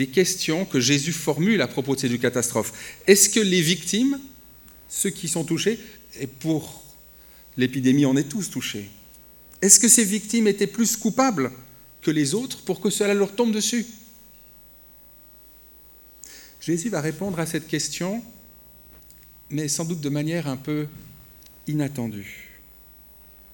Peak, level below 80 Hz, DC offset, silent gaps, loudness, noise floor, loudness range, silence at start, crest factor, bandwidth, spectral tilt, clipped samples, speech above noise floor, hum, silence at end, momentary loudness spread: 0 dBFS; -58 dBFS; under 0.1%; none; -22 LUFS; -49 dBFS; 11 LU; 0 s; 24 dB; over 20 kHz; -3.5 dB/octave; under 0.1%; 27 dB; 60 Hz at -55 dBFS; 1.05 s; 19 LU